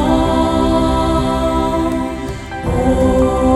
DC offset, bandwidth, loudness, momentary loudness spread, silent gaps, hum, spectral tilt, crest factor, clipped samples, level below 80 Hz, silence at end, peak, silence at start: under 0.1%; 13.5 kHz; -16 LUFS; 9 LU; none; none; -6.5 dB/octave; 12 dB; under 0.1%; -24 dBFS; 0 s; -2 dBFS; 0 s